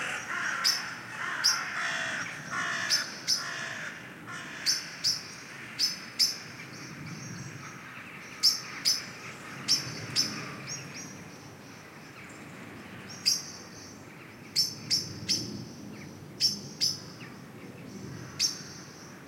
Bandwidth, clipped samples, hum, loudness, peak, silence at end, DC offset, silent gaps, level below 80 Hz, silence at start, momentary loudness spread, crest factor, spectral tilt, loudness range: 16.5 kHz; under 0.1%; none; -29 LUFS; -12 dBFS; 0 s; under 0.1%; none; -72 dBFS; 0 s; 19 LU; 22 dB; -1 dB/octave; 6 LU